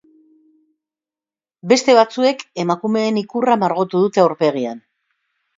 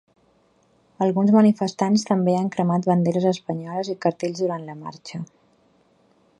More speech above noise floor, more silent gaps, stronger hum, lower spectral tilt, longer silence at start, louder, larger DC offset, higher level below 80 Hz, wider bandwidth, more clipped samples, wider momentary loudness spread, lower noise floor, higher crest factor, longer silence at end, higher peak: first, over 74 dB vs 40 dB; neither; neither; second, -5 dB/octave vs -7 dB/octave; first, 1.65 s vs 1 s; first, -17 LUFS vs -21 LUFS; neither; about the same, -68 dBFS vs -68 dBFS; second, 7.8 kHz vs 10.5 kHz; neither; second, 11 LU vs 18 LU; first, under -90 dBFS vs -61 dBFS; about the same, 18 dB vs 18 dB; second, 0.8 s vs 1.15 s; first, 0 dBFS vs -4 dBFS